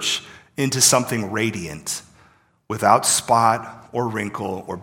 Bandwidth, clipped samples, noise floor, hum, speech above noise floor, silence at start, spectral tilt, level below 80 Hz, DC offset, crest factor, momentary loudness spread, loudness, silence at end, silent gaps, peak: 17.5 kHz; under 0.1%; -56 dBFS; none; 35 dB; 0 s; -3 dB/octave; -58 dBFS; under 0.1%; 22 dB; 14 LU; -20 LUFS; 0 s; none; 0 dBFS